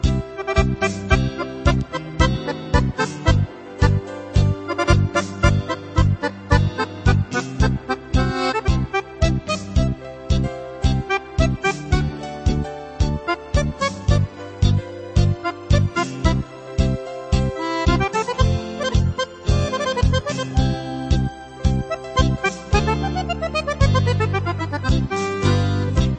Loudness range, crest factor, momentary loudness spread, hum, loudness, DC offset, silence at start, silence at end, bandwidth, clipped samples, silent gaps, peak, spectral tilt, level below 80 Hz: 2 LU; 20 dB; 6 LU; none; -21 LUFS; under 0.1%; 0 s; 0 s; 8.8 kHz; under 0.1%; none; 0 dBFS; -6 dB/octave; -26 dBFS